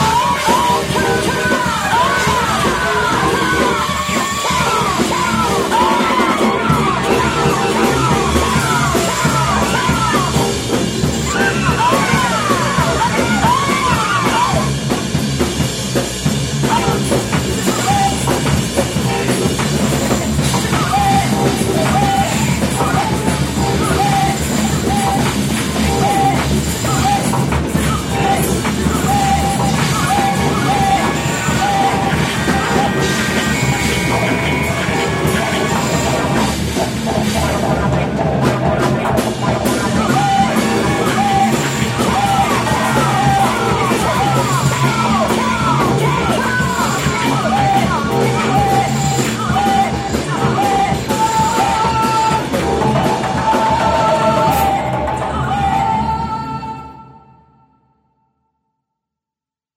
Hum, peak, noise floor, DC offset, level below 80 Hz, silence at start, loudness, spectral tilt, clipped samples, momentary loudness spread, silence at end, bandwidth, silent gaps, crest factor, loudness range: none; -2 dBFS; -88 dBFS; under 0.1%; -30 dBFS; 0 s; -15 LUFS; -4.5 dB/octave; under 0.1%; 3 LU; 2.65 s; 16.5 kHz; none; 14 dB; 2 LU